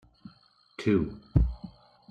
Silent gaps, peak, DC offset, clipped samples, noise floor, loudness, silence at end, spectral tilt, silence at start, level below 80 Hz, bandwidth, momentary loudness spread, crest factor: none; -8 dBFS; under 0.1%; under 0.1%; -61 dBFS; -29 LUFS; 0.4 s; -8.5 dB/octave; 0.25 s; -36 dBFS; 8.4 kHz; 20 LU; 22 dB